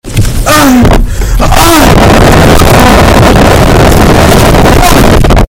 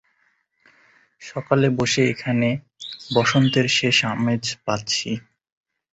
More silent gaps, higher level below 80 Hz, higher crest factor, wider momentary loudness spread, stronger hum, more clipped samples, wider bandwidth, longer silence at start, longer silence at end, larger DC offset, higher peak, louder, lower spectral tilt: neither; first, -8 dBFS vs -58 dBFS; second, 2 dB vs 20 dB; second, 5 LU vs 15 LU; neither; first, 20% vs under 0.1%; first, over 20 kHz vs 8.2 kHz; second, 0.05 s vs 1.2 s; second, 0.05 s vs 0.7 s; neither; first, 0 dBFS vs -4 dBFS; first, -3 LUFS vs -20 LUFS; about the same, -5 dB/octave vs -4.5 dB/octave